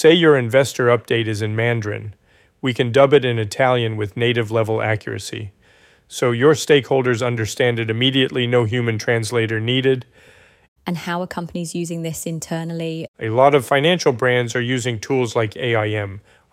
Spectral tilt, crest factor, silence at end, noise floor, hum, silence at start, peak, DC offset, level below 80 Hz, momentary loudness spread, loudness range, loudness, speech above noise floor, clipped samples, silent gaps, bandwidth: -5 dB/octave; 18 dB; 0.3 s; -53 dBFS; none; 0 s; -2 dBFS; under 0.1%; -58 dBFS; 12 LU; 5 LU; -19 LUFS; 35 dB; under 0.1%; 10.68-10.76 s, 13.08-13.14 s; 15.5 kHz